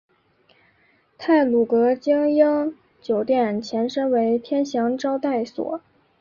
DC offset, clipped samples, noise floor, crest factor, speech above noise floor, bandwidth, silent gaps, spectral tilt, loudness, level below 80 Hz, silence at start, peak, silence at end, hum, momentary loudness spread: under 0.1%; under 0.1%; -61 dBFS; 16 dB; 41 dB; 7.4 kHz; none; -6 dB/octave; -21 LUFS; -66 dBFS; 1.2 s; -6 dBFS; 0.45 s; none; 11 LU